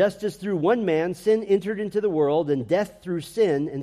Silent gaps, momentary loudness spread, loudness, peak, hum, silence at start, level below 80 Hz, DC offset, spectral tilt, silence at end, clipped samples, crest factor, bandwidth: none; 7 LU; -24 LUFS; -8 dBFS; none; 0 s; -60 dBFS; under 0.1%; -7 dB/octave; 0 s; under 0.1%; 14 dB; 14 kHz